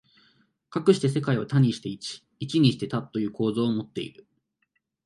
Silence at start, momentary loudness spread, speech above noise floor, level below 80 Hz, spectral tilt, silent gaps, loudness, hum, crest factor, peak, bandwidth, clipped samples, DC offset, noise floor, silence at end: 0.7 s; 14 LU; 51 dB; -66 dBFS; -7 dB/octave; none; -26 LUFS; none; 20 dB; -6 dBFS; 11.5 kHz; under 0.1%; under 0.1%; -75 dBFS; 0.95 s